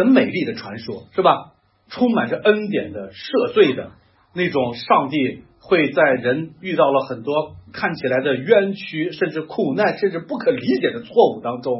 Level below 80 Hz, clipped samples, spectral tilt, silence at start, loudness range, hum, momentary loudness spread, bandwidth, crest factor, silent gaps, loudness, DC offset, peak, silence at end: -62 dBFS; under 0.1%; -9.5 dB/octave; 0 s; 2 LU; none; 10 LU; 5.8 kHz; 18 dB; none; -19 LUFS; under 0.1%; 0 dBFS; 0 s